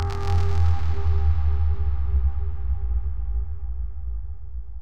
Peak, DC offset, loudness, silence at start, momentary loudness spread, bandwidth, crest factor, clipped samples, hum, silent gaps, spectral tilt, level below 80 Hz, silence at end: -10 dBFS; 6%; -26 LUFS; 0 s; 11 LU; 6.4 kHz; 12 dB; under 0.1%; none; none; -7.5 dB/octave; -26 dBFS; 0 s